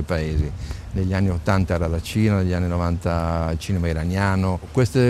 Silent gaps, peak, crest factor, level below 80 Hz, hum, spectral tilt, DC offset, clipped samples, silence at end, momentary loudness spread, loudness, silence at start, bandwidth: none; -4 dBFS; 16 dB; -34 dBFS; none; -7 dB/octave; under 0.1%; under 0.1%; 0 s; 5 LU; -22 LUFS; 0 s; 13.5 kHz